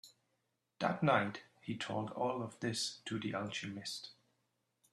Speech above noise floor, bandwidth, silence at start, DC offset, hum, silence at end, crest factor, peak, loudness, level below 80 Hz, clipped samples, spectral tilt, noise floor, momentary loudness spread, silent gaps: 45 dB; 13 kHz; 0.05 s; under 0.1%; none; 0.8 s; 24 dB; -16 dBFS; -38 LUFS; -78 dBFS; under 0.1%; -4.5 dB/octave; -83 dBFS; 13 LU; none